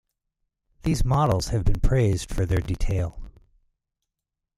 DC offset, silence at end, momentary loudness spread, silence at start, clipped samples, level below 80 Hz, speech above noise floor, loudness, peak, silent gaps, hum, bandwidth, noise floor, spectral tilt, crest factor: under 0.1%; 1.25 s; 6 LU; 0.85 s; under 0.1%; -30 dBFS; 64 dB; -25 LUFS; -8 dBFS; none; none; 14 kHz; -85 dBFS; -6.5 dB/octave; 16 dB